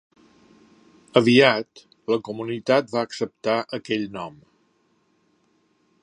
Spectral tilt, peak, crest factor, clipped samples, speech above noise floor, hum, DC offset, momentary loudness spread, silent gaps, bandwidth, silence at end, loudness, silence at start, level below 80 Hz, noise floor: -5.5 dB/octave; 0 dBFS; 24 dB; under 0.1%; 44 dB; none; under 0.1%; 18 LU; none; 10.5 kHz; 1.75 s; -22 LUFS; 1.15 s; -68 dBFS; -66 dBFS